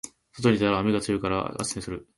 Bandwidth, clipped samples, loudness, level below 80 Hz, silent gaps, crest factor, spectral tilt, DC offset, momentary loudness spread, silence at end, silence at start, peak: 11.5 kHz; under 0.1%; -26 LUFS; -50 dBFS; none; 18 dB; -5 dB/octave; under 0.1%; 9 LU; 0.15 s; 0.05 s; -8 dBFS